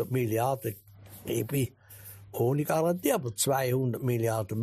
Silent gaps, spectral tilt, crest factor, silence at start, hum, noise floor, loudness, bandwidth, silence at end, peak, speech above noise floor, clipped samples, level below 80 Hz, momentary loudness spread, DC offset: none; -5.5 dB/octave; 16 dB; 0 s; none; -49 dBFS; -29 LUFS; 15.5 kHz; 0 s; -14 dBFS; 20 dB; under 0.1%; -64 dBFS; 17 LU; under 0.1%